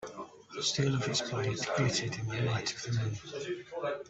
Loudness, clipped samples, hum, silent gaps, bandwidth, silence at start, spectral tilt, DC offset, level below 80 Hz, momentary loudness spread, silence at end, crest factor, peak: -33 LUFS; under 0.1%; none; none; 8.2 kHz; 0 s; -4 dB/octave; under 0.1%; -64 dBFS; 9 LU; 0 s; 18 dB; -16 dBFS